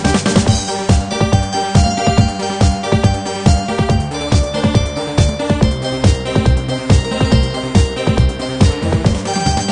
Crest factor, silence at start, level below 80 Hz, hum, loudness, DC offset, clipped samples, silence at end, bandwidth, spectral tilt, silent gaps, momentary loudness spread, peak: 14 dB; 0 s; -20 dBFS; none; -15 LUFS; under 0.1%; under 0.1%; 0 s; 10 kHz; -5.5 dB/octave; none; 3 LU; 0 dBFS